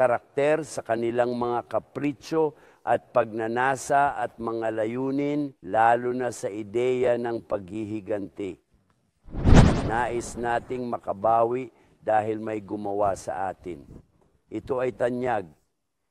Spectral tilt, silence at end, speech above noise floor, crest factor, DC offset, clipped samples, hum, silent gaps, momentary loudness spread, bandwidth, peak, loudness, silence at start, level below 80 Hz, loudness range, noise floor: -6.5 dB/octave; 0.6 s; 50 dB; 22 dB; under 0.1%; under 0.1%; none; none; 11 LU; 13.5 kHz; -4 dBFS; -26 LUFS; 0 s; -36 dBFS; 6 LU; -76 dBFS